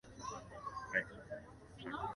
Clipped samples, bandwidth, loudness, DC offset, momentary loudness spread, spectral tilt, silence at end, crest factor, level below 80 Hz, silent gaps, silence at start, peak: under 0.1%; 11.5 kHz; -44 LUFS; under 0.1%; 12 LU; -4 dB/octave; 0 s; 24 dB; -64 dBFS; none; 0.05 s; -20 dBFS